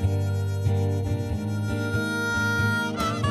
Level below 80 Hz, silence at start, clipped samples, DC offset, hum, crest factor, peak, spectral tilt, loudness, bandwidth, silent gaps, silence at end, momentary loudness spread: -42 dBFS; 0 s; under 0.1%; under 0.1%; none; 14 dB; -12 dBFS; -6 dB/octave; -26 LUFS; 13.5 kHz; none; 0 s; 5 LU